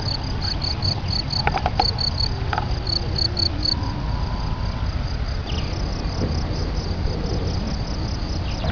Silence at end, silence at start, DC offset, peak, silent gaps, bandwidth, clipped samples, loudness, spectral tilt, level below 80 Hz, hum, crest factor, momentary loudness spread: 0 s; 0 s; 0.8%; -4 dBFS; none; 5.4 kHz; under 0.1%; -23 LUFS; -5.5 dB/octave; -28 dBFS; none; 20 dB; 7 LU